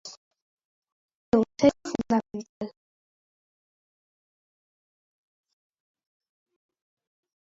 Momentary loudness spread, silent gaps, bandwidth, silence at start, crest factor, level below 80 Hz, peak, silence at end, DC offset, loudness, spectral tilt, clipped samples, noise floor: 17 LU; 0.17-0.31 s, 0.42-0.57 s, 0.65-0.82 s, 0.92-1.08 s, 1.15-1.32 s, 2.49-2.61 s; 7.6 kHz; 0.05 s; 24 dB; -62 dBFS; -8 dBFS; 4.75 s; under 0.1%; -25 LUFS; -5.5 dB/octave; under 0.1%; under -90 dBFS